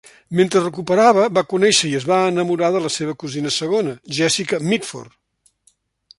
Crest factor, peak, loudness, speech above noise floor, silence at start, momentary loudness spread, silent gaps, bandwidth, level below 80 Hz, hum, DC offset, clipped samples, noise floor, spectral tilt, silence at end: 16 dB; -2 dBFS; -18 LUFS; 43 dB; 0.3 s; 10 LU; none; 11.5 kHz; -62 dBFS; none; under 0.1%; under 0.1%; -61 dBFS; -4 dB/octave; 1.1 s